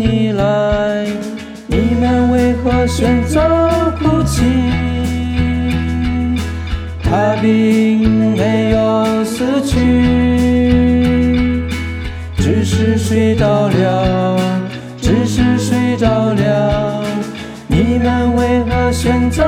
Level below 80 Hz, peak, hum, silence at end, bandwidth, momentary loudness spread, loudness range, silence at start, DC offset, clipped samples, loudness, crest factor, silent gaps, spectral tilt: -28 dBFS; 0 dBFS; none; 0 s; 15 kHz; 8 LU; 2 LU; 0 s; under 0.1%; under 0.1%; -14 LUFS; 12 dB; none; -6.5 dB/octave